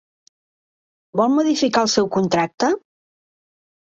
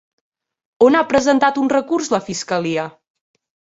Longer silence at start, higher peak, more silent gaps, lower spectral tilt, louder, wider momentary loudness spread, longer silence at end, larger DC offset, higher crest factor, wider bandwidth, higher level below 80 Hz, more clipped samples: first, 1.15 s vs 0.8 s; about the same, -4 dBFS vs -2 dBFS; first, 2.54-2.58 s vs none; about the same, -4.5 dB/octave vs -4.5 dB/octave; about the same, -19 LUFS vs -17 LUFS; second, 5 LU vs 9 LU; first, 1.2 s vs 0.8 s; neither; about the same, 18 dB vs 16 dB; about the same, 8 kHz vs 8 kHz; second, -60 dBFS vs -54 dBFS; neither